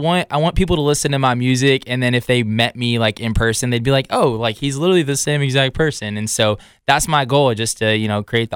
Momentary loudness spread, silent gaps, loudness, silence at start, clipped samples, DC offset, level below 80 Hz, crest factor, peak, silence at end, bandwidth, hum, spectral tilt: 4 LU; none; -17 LUFS; 0 s; under 0.1%; under 0.1%; -34 dBFS; 14 dB; -2 dBFS; 0 s; 17 kHz; none; -4.5 dB/octave